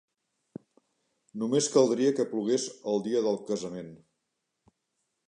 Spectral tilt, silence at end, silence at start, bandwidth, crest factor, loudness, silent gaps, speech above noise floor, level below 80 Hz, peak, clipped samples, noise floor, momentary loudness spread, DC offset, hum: -4.5 dB/octave; 1.3 s; 1.35 s; 10.5 kHz; 22 dB; -28 LUFS; none; 54 dB; -78 dBFS; -10 dBFS; under 0.1%; -82 dBFS; 25 LU; under 0.1%; none